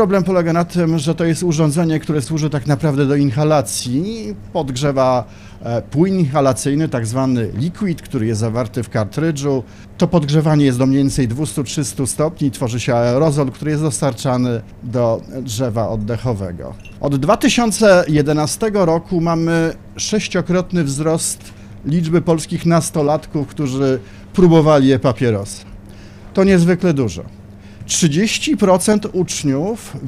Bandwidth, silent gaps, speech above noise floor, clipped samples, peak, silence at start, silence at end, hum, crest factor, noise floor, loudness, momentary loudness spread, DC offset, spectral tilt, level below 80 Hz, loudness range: 15.5 kHz; none; 20 dB; under 0.1%; -2 dBFS; 0 s; 0 s; none; 14 dB; -36 dBFS; -16 LUFS; 10 LU; under 0.1%; -6 dB/octave; -40 dBFS; 4 LU